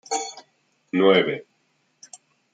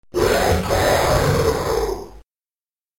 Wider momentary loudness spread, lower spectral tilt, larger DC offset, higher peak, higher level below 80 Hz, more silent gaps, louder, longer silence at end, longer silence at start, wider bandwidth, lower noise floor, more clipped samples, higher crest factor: first, 16 LU vs 7 LU; about the same, -4 dB/octave vs -4.5 dB/octave; second, under 0.1% vs 0.3%; about the same, -4 dBFS vs -6 dBFS; second, -74 dBFS vs -32 dBFS; neither; second, -21 LUFS vs -18 LUFS; first, 1.1 s vs 0.8 s; about the same, 0.1 s vs 0.15 s; second, 9.6 kHz vs 17 kHz; second, -68 dBFS vs under -90 dBFS; neither; first, 20 dB vs 14 dB